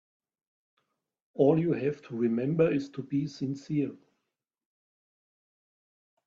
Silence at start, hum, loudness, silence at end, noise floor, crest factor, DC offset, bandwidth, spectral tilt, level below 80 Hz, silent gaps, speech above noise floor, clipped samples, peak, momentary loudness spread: 1.35 s; none; -29 LUFS; 2.3 s; -85 dBFS; 22 dB; under 0.1%; 7.6 kHz; -8.5 dB/octave; -70 dBFS; none; 57 dB; under 0.1%; -10 dBFS; 10 LU